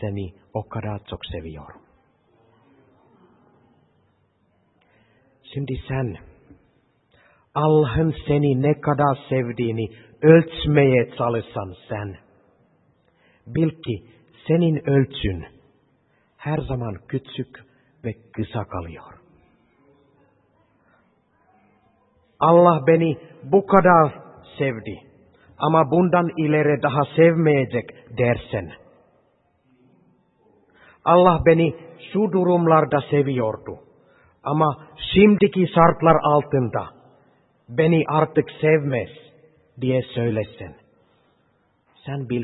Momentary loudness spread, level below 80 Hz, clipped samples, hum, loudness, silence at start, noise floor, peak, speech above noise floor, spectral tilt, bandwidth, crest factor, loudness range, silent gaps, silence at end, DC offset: 18 LU; -48 dBFS; under 0.1%; none; -20 LUFS; 0 s; -64 dBFS; 0 dBFS; 45 dB; -11.5 dB/octave; 4.1 kHz; 22 dB; 15 LU; none; 0 s; under 0.1%